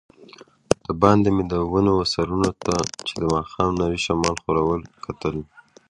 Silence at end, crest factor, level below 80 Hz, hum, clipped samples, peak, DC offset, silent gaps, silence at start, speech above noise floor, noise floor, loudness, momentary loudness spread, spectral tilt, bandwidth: 0.45 s; 22 dB; -42 dBFS; none; under 0.1%; 0 dBFS; under 0.1%; none; 0.2 s; 26 dB; -48 dBFS; -22 LUFS; 10 LU; -5.5 dB/octave; 11.5 kHz